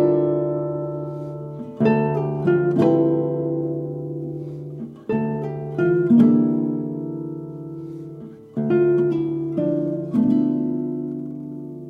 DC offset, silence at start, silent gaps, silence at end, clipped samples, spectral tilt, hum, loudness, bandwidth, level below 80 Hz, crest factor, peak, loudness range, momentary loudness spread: under 0.1%; 0 s; none; 0 s; under 0.1%; -10.5 dB/octave; none; -21 LUFS; 5.2 kHz; -58 dBFS; 18 dB; -4 dBFS; 3 LU; 16 LU